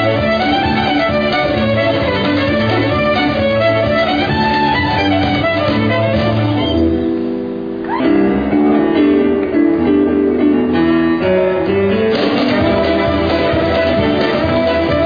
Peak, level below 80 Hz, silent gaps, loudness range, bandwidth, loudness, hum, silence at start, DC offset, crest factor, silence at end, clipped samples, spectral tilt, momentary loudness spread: -2 dBFS; -34 dBFS; none; 2 LU; 5.2 kHz; -14 LUFS; none; 0 s; 0.3%; 12 dB; 0 s; under 0.1%; -8 dB/octave; 2 LU